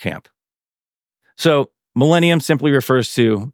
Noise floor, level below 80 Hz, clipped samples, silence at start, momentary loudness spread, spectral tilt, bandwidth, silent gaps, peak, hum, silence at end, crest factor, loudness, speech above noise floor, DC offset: under -90 dBFS; -62 dBFS; under 0.1%; 0 s; 9 LU; -6 dB/octave; 19 kHz; 0.98-1.02 s; -2 dBFS; none; 0.05 s; 16 dB; -16 LUFS; over 74 dB; under 0.1%